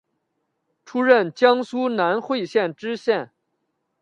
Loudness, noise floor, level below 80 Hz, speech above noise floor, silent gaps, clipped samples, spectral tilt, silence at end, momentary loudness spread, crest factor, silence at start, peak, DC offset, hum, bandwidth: -21 LUFS; -75 dBFS; -74 dBFS; 55 dB; none; under 0.1%; -5.5 dB/octave; 0.75 s; 9 LU; 20 dB; 0.9 s; -2 dBFS; under 0.1%; none; 7.8 kHz